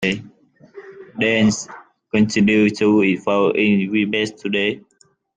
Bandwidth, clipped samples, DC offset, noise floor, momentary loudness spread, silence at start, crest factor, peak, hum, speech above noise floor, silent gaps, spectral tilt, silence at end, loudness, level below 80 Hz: 9.2 kHz; under 0.1%; under 0.1%; -49 dBFS; 11 LU; 0 s; 16 dB; -4 dBFS; none; 32 dB; none; -5 dB/octave; 0.55 s; -18 LUFS; -56 dBFS